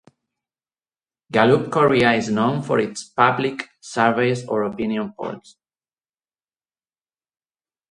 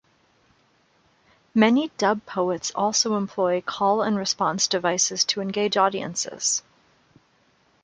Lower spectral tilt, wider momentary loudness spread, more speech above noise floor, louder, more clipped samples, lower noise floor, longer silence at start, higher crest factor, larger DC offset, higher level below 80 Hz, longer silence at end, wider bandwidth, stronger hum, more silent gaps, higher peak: first, -5.5 dB/octave vs -2.5 dB/octave; first, 13 LU vs 5 LU; first, over 70 dB vs 40 dB; first, -20 LUFS vs -23 LUFS; neither; first, under -90 dBFS vs -63 dBFS; second, 1.3 s vs 1.55 s; about the same, 22 dB vs 20 dB; neither; first, -60 dBFS vs -68 dBFS; first, 2.5 s vs 1.25 s; about the same, 11 kHz vs 10 kHz; neither; neither; first, 0 dBFS vs -4 dBFS